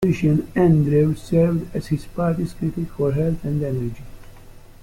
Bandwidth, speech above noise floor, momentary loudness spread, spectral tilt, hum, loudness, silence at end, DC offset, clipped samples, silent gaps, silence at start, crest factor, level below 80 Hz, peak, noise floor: 14 kHz; 22 dB; 10 LU; -9 dB/octave; none; -21 LUFS; 0.1 s; under 0.1%; under 0.1%; none; 0 s; 16 dB; -40 dBFS; -6 dBFS; -42 dBFS